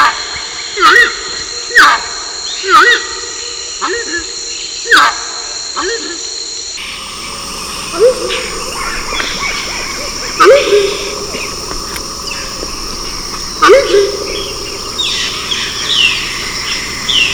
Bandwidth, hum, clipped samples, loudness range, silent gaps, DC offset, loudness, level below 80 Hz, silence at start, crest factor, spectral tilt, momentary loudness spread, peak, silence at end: over 20 kHz; none; 0.9%; 7 LU; none; under 0.1%; -12 LUFS; -34 dBFS; 0 s; 14 dB; -1 dB/octave; 13 LU; 0 dBFS; 0 s